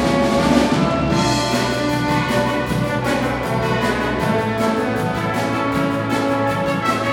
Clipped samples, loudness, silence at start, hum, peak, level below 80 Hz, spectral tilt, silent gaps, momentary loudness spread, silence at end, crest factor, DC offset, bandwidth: under 0.1%; -18 LUFS; 0 s; none; -2 dBFS; -38 dBFS; -5.5 dB/octave; none; 4 LU; 0 s; 16 dB; under 0.1%; 18 kHz